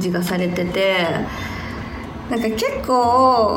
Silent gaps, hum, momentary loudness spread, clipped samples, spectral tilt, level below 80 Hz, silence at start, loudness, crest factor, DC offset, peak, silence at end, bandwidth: none; none; 15 LU; under 0.1%; -5.5 dB/octave; -40 dBFS; 0 s; -19 LUFS; 16 dB; under 0.1%; -2 dBFS; 0 s; 19.5 kHz